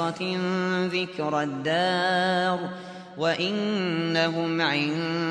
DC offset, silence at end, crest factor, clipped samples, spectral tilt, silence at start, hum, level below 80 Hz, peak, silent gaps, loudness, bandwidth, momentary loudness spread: under 0.1%; 0 s; 14 dB; under 0.1%; -5.5 dB/octave; 0 s; none; -72 dBFS; -10 dBFS; none; -25 LUFS; 10.5 kHz; 5 LU